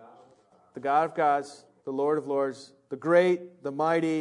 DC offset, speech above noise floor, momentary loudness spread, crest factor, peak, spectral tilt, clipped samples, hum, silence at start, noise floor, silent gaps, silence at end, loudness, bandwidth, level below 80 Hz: under 0.1%; 34 dB; 19 LU; 18 dB; -10 dBFS; -6.5 dB/octave; under 0.1%; none; 0.75 s; -61 dBFS; none; 0 s; -27 LUFS; 10.5 kHz; -86 dBFS